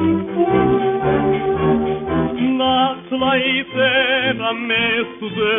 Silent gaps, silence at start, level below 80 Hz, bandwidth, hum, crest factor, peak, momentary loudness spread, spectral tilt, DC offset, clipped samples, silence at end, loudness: none; 0 s; -44 dBFS; 3.8 kHz; none; 14 dB; -4 dBFS; 5 LU; -3 dB/octave; under 0.1%; under 0.1%; 0 s; -17 LUFS